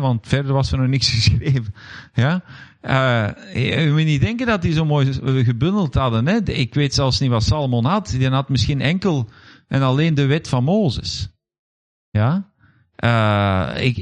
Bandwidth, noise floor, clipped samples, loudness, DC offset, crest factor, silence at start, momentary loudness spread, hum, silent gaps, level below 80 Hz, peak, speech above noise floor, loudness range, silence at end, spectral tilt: 9.6 kHz; -56 dBFS; under 0.1%; -19 LUFS; under 0.1%; 16 dB; 0 s; 8 LU; none; 11.59-12.12 s; -38 dBFS; -2 dBFS; 38 dB; 3 LU; 0 s; -6 dB/octave